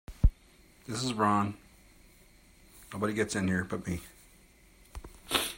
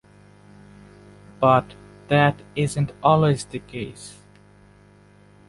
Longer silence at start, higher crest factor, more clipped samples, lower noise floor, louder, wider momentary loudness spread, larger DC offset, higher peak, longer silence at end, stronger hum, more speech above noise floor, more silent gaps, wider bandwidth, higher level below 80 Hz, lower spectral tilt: second, 0.1 s vs 1.4 s; about the same, 26 dB vs 22 dB; neither; first, -60 dBFS vs -52 dBFS; second, -32 LUFS vs -21 LUFS; first, 22 LU vs 18 LU; neither; second, -8 dBFS vs -2 dBFS; second, 0 s vs 1.4 s; second, none vs 50 Hz at -40 dBFS; about the same, 29 dB vs 31 dB; neither; first, 16.5 kHz vs 11.5 kHz; first, -38 dBFS vs -54 dBFS; second, -4.5 dB/octave vs -6.5 dB/octave